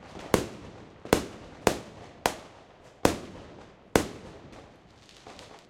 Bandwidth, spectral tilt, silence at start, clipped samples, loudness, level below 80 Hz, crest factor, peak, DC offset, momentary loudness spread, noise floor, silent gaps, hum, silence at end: 16 kHz; -4 dB/octave; 0 s; under 0.1%; -30 LUFS; -50 dBFS; 30 dB; -4 dBFS; under 0.1%; 21 LU; -54 dBFS; none; none; 0.15 s